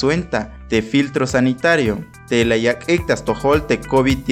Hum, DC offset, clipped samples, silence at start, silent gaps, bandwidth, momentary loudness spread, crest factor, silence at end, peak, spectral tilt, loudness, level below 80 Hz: none; under 0.1%; under 0.1%; 0 s; none; 15.5 kHz; 5 LU; 14 dB; 0 s; -2 dBFS; -5.5 dB/octave; -18 LUFS; -36 dBFS